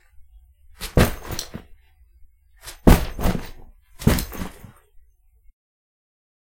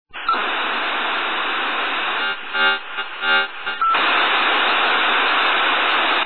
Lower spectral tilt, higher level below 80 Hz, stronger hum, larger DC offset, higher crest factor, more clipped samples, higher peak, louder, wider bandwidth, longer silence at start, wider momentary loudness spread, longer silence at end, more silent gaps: first, -5.5 dB/octave vs -3.5 dB/octave; first, -30 dBFS vs -62 dBFS; neither; second, under 0.1% vs 1%; first, 24 dB vs 12 dB; neither; first, 0 dBFS vs -6 dBFS; second, -22 LUFS vs -18 LUFS; first, 17 kHz vs 4.5 kHz; first, 0.2 s vs 0.05 s; first, 23 LU vs 6 LU; first, 2 s vs 0 s; neither